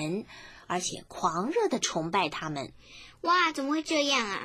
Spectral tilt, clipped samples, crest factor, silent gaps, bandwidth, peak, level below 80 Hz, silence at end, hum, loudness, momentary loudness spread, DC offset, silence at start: -3 dB/octave; under 0.1%; 18 dB; none; 16 kHz; -12 dBFS; -64 dBFS; 0 s; none; -29 LUFS; 18 LU; under 0.1%; 0 s